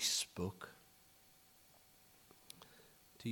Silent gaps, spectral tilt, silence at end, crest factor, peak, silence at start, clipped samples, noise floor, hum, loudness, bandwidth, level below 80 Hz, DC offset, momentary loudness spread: none; -2 dB/octave; 0 s; 24 dB; -24 dBFS; 0 s; under 0.1%; -67 dBFS; none; -43 LUFS; 19 kHz; -76 dBFS; under 0.1%; 24 LU